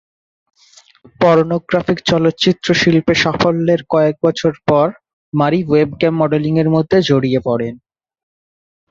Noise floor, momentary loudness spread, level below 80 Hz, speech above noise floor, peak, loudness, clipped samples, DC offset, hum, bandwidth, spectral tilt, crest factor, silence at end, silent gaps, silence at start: -48 dBFS; 5 LU; -48 dBFS; 34 dB; 0 dBFS; -14 LUFS; under 0.1%; under 0.1%; none; 7.6 kHz; -6 dB/octave; 14 dB; 1.15 s; 5.13-5.32 s; 1.2 s